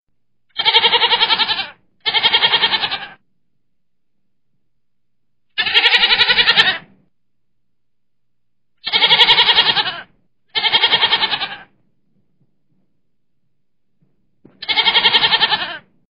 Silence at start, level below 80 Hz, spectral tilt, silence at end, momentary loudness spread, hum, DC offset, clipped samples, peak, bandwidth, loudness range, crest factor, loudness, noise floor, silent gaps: 0.55 s; -56 dBFS; -2 dB/octave; 0.35 s; 16 LU; none; 0.1%; under 0.1%; 0 dBFS; 11 kHz; 8 LU; 18 dB; -12 LUFS; -79 dBFS; none